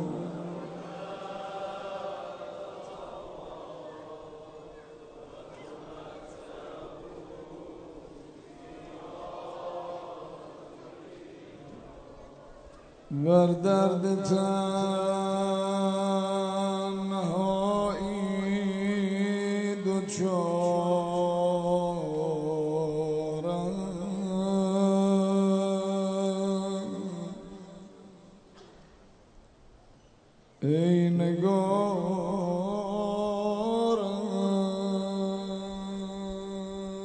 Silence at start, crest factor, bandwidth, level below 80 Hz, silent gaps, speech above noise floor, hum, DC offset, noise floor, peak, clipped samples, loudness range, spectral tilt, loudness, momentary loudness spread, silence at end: 0 s; 20 dB; 9.4 kHz; -60 dBFS; none; 33 dB; none; under 0.1%; -58 dBFS; -10 dBFS; under 0.1%; 18 LU; -7 dB/octave; -29 LUFS; 22 LU; 0 s